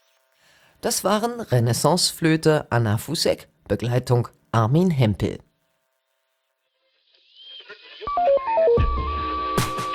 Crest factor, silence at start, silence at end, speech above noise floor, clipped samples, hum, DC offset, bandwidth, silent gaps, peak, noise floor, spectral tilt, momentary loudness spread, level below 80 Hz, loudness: 18 dB; 0.85 s; 0 s; 53 dB; under 0.1%; none; under 0.1%; 18.5 kHz; none; -6 dBFS; -73 dBFS; -5 dB/octave; 11 LU; -38 dBFS; -22 LUFS